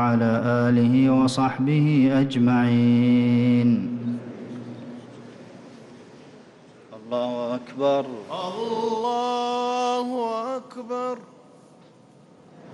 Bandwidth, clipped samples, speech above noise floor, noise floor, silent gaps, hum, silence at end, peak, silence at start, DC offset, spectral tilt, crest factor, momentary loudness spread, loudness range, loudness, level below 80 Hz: 10.5 kHz; under 0.1%; 31 dB; -52 dBFS; none; none; 0 s; -10 dBFS; 0 s; under 0.1%; -7.5 dB/octave; 12 dB; 18 LU; 14 LU; -22 LUFS; -62 dBFS